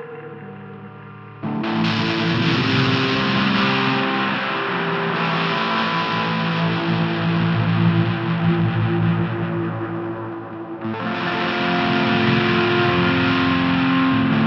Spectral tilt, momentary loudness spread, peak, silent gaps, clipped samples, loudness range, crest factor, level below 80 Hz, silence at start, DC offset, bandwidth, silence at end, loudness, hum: -7 dB/octave; 13 LU; -6 dBFS; none; under 0.1%; 4 LU; 14 dB; -52 dBFS; 0 s; under 0.1%; 6.8 kHz; 0 s; -19 LUFS; none